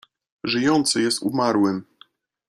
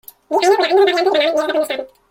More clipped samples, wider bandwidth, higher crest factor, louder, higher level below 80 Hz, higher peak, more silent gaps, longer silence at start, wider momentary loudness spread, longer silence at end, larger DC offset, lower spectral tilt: neither; second, 14 kHz vs 16.5 kHz; about the same, 16 dB vs 14 dB; second, -21 LUFS vs -15 LUFS; about the same, -64 dBFS vs -62 dBFS; second, -6 dBFS vs -2 dBFS; neither; first, 0.45 s vs 0.3 s; about the same, 9 LU vs 9 LU; first, 0.65 s vs 0.25 s; neither; first, -4 dB/octave vs -2 dB/octave